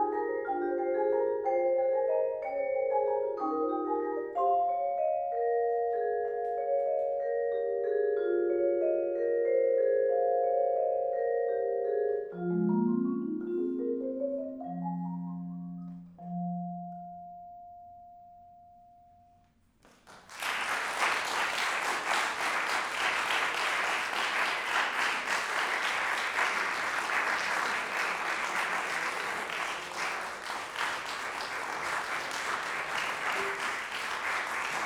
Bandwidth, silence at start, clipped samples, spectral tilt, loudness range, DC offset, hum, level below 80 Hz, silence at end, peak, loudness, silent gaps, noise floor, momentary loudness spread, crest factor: 18.5 kHz; 0 s; under 0.1%; -3.5 dB/octave; 10 LU; under 0.1%; none; -72 dBFS; 0 s; -14 dBFS; -31 LUFS; none; -65 dBFS; 8 LU; 16 dB